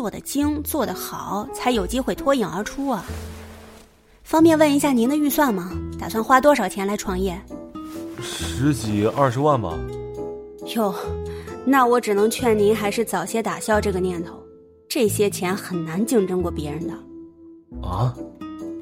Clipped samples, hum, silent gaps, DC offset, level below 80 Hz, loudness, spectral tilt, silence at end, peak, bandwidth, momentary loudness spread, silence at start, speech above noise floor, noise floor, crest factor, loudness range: under 0.1%; none; none; under 0.1%; -42 dBFS; -21 LUFS; -5.5 dB/octave; 0 s; -2 dBFS; 16.5 kHz; 17 LU; 0 s; 29 dB; -50 dBFS; 20 dB; 6 LU